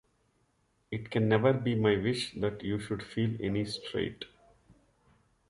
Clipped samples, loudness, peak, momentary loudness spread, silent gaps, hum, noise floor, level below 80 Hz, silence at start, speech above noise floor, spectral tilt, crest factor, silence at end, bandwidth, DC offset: under 0.1%; -31 LUFS; -12 dBFS; 13 LU; none; none; -73 dBFS; -58 dBFS; 0.9 s; 42 dB; -6.5 dB/octave; 20 dB; 1.25 s; 11.5 kHz; under 0.1%